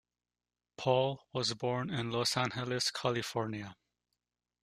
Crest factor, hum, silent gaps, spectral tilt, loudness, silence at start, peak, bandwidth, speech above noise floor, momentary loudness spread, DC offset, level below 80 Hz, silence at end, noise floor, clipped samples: 20 dB; 60 Hz at -60 dBFS; none; -4 dB/octave; -34 LUFS; 0.8 s; -16 dBFS; 15 kHz; over 56 dB; 7 LU; under 0.1%; -70 dBFS; 0.9 s; under -90 dBFS; under 0.1%